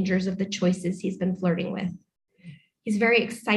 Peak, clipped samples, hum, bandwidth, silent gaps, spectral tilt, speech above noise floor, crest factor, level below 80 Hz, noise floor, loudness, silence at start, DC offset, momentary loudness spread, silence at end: -8 dBFS; under 0.1%; none; 12 kHz; none; -6 dB/octave; 23 dB; 18 dB; -62 dBFS; -48 dBFS; -26 LUFS; 0 s; under 0.1%; 12 LU; 0 s